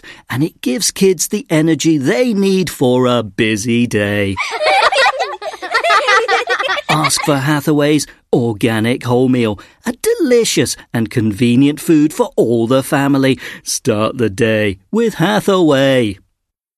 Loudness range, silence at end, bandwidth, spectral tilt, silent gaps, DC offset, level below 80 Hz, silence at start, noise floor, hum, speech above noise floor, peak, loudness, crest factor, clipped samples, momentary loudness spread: 2 LU; 0.6 s; 13.5 kHz; -4.5 dB/octave; none; under 0.1%; -50 dBFS; 0.05 s; -70 dBFS; none; 57 dB; 0 dBFS; -14 LUFS; 14 dB; under 0.1%; 7 LU